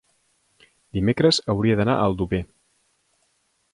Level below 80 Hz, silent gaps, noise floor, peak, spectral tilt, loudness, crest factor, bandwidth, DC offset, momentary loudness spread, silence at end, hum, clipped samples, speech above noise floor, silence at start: -44 dBFS; none; -68 dBFS; -6 dBFS; -6 dB/octave; -21 LUFS; 18 dB; 11.5 kHz; under 0.1%; 10 LU; 1.3 s; none; under 0.1%; 48 dB; 0.95 s